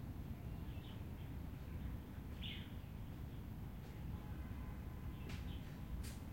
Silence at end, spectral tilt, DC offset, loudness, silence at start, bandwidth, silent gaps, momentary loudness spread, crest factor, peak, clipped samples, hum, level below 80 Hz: 0 s; -6.5 dB/octave; under 0.1%; -50 LUFS; 0 s; 16.5 kHz; none; 3 LU; 14 dB; -34 dBFS; under 0.1%; none; -52 dBFS